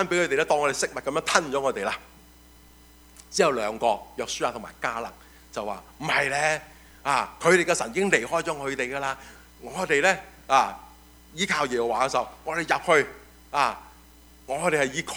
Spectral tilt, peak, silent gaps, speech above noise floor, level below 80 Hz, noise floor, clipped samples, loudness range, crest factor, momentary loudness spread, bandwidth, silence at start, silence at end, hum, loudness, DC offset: -3 dB/octave; -2 dBFS; none; 27 dB; -56 dBFS; -52 dBFS; under 0.1%; 4 LU; 24 dB; 12 LU; over 20 kHz; 0 s; 0 s; none; -25 LUFS; under 0.1%